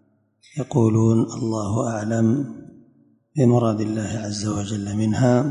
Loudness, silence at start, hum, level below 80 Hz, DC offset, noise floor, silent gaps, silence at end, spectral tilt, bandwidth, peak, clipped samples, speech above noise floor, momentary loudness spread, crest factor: -21 LUFS; 0.55 s; none; -50 dBFS; under 0.1%; -58 dBFS; none; 0 s; -7 dB/octave; 10.5 kHz; -4 dBFS; under 0.1%; 38 dB; 11 LU; 16 dB